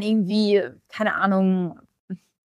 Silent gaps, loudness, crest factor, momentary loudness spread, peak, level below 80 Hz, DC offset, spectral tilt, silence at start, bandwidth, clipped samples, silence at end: 2.00-2.08 s; -22 LUFS; 14 dB; 19 LU; -8 dBFS; -68 dBFS; under 0.1%; -7.5 dB/octave; 0 s; 10 kHz; under 0.1%; 0.3 s